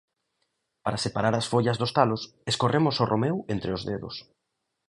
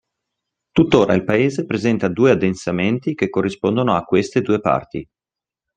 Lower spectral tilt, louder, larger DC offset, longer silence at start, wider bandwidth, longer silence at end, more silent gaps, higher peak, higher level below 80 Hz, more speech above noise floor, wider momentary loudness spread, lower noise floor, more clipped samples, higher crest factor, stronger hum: second, -5.5 dB/octave vs -7 dB/octave; second, -26 LUFS vs -18 LUFS; neither; about the same, 0.85 s vs 0.75 s; first, 11.5 kHz vs 9.4 kHz; about the same, 0.65 s vs 0.75 s; neither; second, -4 dBFS vs 0 dBFS; about the same, -56 dBFS vs -52 dBFS; second, 55 dB vs 71 dB; first, 10 LU vs 6 LU; second, -81 dBFS vs -89 dBFS; neither; about the same, 22 dB vs 18 dB; neither